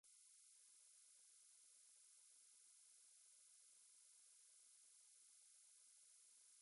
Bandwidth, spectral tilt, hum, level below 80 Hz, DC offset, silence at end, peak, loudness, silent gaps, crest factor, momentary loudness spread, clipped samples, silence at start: 11.5 kHz; 4 dB/octave; none; under -90 dBFS; under 0.1%; 0 s; -58 dBFS; -68 LUFS; none; 12 dB; 0 LU; under 0.1%; 0.05 s